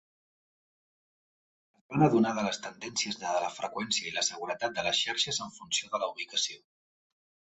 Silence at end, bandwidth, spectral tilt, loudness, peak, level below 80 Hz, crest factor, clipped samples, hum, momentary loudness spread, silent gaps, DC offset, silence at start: 0.85 s; 8.2 kHz; -3 dB/octave; -30 LUFS; -10 dBFS; -72 dBFS; 22 dB; under 0.1%; none; 9 LU; none; under 0.1%; 1.9 s